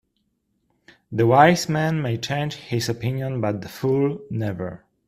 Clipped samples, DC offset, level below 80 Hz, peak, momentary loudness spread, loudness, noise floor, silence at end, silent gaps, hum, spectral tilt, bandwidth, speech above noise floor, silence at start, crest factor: under 0.1%; under 0.1%; -56 dBFS; 0 dBFS; 13 LU; -22 LUFS; -71 dBFS; 0.3 s; none; none; -6 dB/octave; 15 kHz; 50 dB; 1.1 s; 22 dB